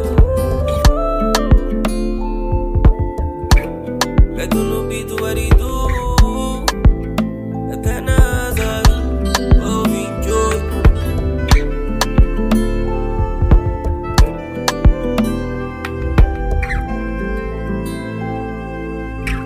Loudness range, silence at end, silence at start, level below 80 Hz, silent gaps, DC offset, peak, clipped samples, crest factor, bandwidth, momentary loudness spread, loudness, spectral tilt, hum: 3 LU; 0 s; 0 s; -18 dBFS; none; under 0.1%; 0 dBFS; under 0.1%; 14 dB; 15.5 kHz; 8 LU; -17 LUFS; -6 dB/octave; none